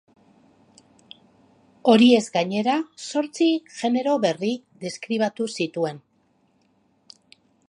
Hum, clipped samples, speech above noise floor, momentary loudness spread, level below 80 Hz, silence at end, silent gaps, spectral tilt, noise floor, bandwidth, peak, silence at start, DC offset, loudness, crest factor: none; under 0.1%; 43 dB; 13 LU; -74 dBFS; 1.7 s; none; -5 dB/octave; -65 dBFS; 11 kHz; -4 dBFS; 1.85 s; under 0.1%; -22 LUFS; 20 dB